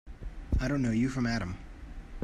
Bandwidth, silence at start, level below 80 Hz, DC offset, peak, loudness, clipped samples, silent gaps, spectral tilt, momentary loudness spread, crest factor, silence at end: 11 kHz; 0.05 s; -38 dBFS; under 0.1%; -18 dBFS; -31 LUFS; under 0.1%; none; -6.5 dB/octave; 19 LU; 14 dB; 0 s